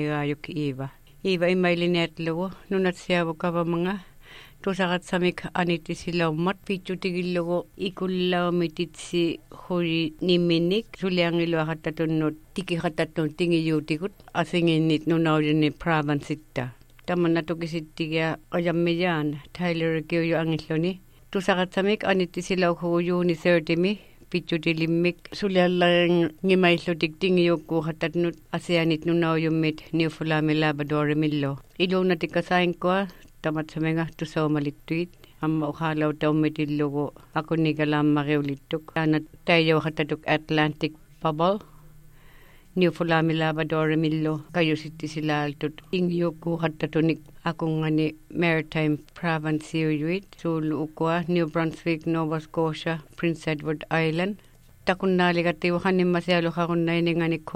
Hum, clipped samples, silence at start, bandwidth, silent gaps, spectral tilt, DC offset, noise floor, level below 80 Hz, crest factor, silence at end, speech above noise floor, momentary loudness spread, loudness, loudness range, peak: none; under 0.1%; 0 s; 13.5 kHz; none; -7 dB/octave; under 0.1%; -50 dBFS; -54 dBFS; 18 dB; 0 s; 25 dB; 8 LU; -25 LUFS; 4 LU; -6 dBFS